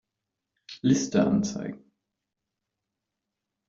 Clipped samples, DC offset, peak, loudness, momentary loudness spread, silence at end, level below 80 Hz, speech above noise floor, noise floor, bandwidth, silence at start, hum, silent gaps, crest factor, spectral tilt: under 0.1%; under 0.1%; -10 dBFS; -26 LUFS; 15 LU; 1.95 s; -62 dBFS; 61 dB; -85 dBFS; 7.8 kHz; 0.7 s; none; none; 20 dB; -5.5 dB/octave